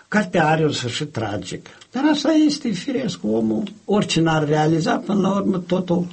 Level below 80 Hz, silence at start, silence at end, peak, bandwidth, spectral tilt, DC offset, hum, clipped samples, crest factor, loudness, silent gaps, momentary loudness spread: -54 dBFS; 0.1 s; 0 s; -6 dBFS; 8.8 kHz; -5.5 dB/octave; under 0.1%; none; under 0.1%; 14 dB; -20 LUFS; none; 9 LU